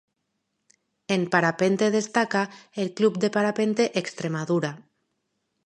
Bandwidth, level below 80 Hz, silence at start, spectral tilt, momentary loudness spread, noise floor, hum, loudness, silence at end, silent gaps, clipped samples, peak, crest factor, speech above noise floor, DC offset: 11 kHz; -74 dBFS; 1.1 s; -5 dB/octave; 9 LU; -78 dBFS; none; -24 LUFS; 0.85 s; none; under 0.1%; -4 dBFS; 22 dB; 54 dB; under 0.1%